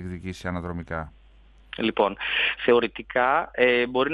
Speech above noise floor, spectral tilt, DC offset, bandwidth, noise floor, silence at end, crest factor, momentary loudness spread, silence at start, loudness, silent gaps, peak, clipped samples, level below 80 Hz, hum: 28 dB; -6 dB/octave; under 0.1%; 10.5 kHz; -53 dBFS; 0 s; 20 dB; 13 LU; 0 s; -24 LUFS; none; -6 dBFS; under 0.1%; -52 dBFS; none